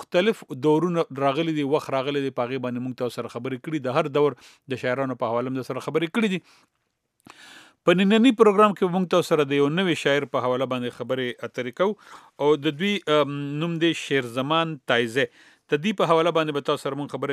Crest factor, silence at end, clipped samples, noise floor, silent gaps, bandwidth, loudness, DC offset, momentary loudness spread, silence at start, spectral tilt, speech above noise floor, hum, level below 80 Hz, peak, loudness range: 20 dB; 0 s; under 0.1%; -71 dBFS; none; 14 kHz; -23 LUFS; under 0.1%; 10 LU; 0 s; -6 dB/octave; 48 dB; none; -78 dBFS; -2 dBFS; 6 LU